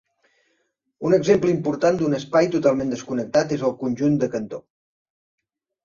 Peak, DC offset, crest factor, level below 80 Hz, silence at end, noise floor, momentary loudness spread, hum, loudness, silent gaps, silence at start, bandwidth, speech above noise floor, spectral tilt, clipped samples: -4 dBFS; under 0.1%; 18 dB; -58 dBFS; 1.25 s; -71 dBFS; 9 LU; none; -21 LUFS; none; 1 s; 7.4 kHz; 51 dB; -6.5 dB/octave; under 0.1%